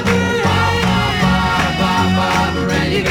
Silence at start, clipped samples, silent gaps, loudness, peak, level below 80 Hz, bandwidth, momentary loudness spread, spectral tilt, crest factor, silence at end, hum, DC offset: 0 s; under 0.1%; none; -15 LUFS; -2 dBFS; -30 dBFS; 16.5 kHz; 2 LU; -5 dB/octave; 12 dB; 0 s; none; under 0.1%